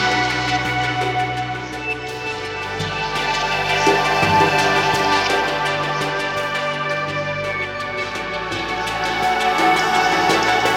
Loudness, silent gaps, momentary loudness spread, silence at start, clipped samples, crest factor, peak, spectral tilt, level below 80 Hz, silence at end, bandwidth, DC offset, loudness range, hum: -19 LUFS; none; 9 LU; 0 s; under 0.1%; 18 dB; -2 dBFS; -3.5 dB/octave; -44 dBFS; 0 s; 17 kHz; under 0.1%; 5 LU; none